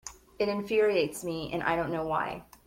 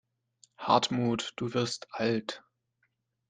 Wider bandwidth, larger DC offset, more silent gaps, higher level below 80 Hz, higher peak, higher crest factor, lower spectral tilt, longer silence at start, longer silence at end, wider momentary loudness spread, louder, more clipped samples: first, 16.5 kHz vs 9.8 kHz; neither; neither; first, -58 dBFS vs -70 dBFS; second, -12 dBFS vs -8 dBFS; second, 18 dB vs 24 dB; about the same, -5 dB/octave vs -4.5 dB/octave; second, 0.05 s vs 0.6 s; second, 0.25 s vs 0.9 s; second, 9 LU vs 14 LU; about the same, -30 LUFS vs -30 LUFS; neither